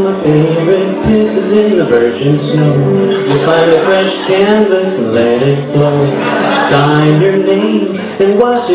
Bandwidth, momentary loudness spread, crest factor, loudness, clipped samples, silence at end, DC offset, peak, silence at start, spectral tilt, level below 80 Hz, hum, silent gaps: 4 kHz; 4 LU; 10 dB; -10 LUFS; 0.3%; 0 s; under 0.1%; 0 dBFS; 0 s; -11 dB/octave; -40 dBFS; none; none